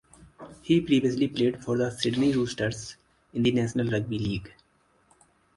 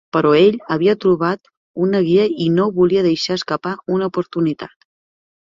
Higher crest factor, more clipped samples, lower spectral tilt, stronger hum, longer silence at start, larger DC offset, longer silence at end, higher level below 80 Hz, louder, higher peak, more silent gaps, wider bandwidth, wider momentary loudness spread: about the same, 18 dB vs 14 dB; neither; about the same, -6 dB/octave vs -7 dB/octave; neither; about the same, 0.2 s vs 0.15 s; neither; first, 1.05 s vs 0.75 s; about the same, -54 dBFS vs -56 dBFS; second, -26 LUFS vs -17 LUFS; second, -8 dBFS vs -2 dBFS; second, none vs 1.57-1.74 s; first, 11.5 kHz vs 7.6 kHz; first, 13 LU vs 9 LU